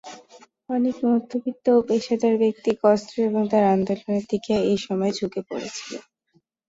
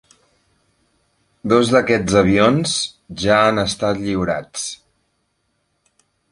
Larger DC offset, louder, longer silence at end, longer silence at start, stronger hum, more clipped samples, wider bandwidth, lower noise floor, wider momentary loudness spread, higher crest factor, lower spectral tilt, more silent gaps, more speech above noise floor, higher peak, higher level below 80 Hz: neither; second, -23 LUFS vs -17 LUFS; second, 0.7 s vs 1.55 s; second, 0.05 s vs 1.45 s; neither; neither; second, 8 kHz vs 11.5 kHz; about the same, -66 dBFS vs -68 dBFS; about the same, 12 LU vs 13 LU; about the same, 16 dB vs 18 dB; first, -6 dB/octave vs -4.5 dB/octave; neither; second, 44 dB vs 52 dB; second, -6 dBFS vs 0 dBFS; second, -62 dBFS vs -44 dBFS